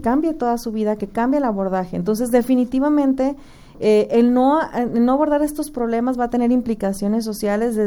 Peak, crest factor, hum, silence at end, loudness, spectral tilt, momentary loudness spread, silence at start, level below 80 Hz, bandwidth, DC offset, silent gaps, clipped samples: -4 dBFS; 16 dB; none; 0 s; -19 LUFS; -6.5 dB/octave; 7 LU; 0 s; -44 dBFS; 17.5 kHz; under 0.1%; none; under 0.1%